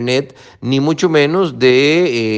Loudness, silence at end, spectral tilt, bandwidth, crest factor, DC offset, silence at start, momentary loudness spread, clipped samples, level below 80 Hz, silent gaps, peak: -13 LUFS; 0 s; -5.5 dB/octave; 8.6 kHz; 14 dB; under 0.1%; 0 s; 8 LU; under 0.1%; -56 dBFS; none; 0 dBFS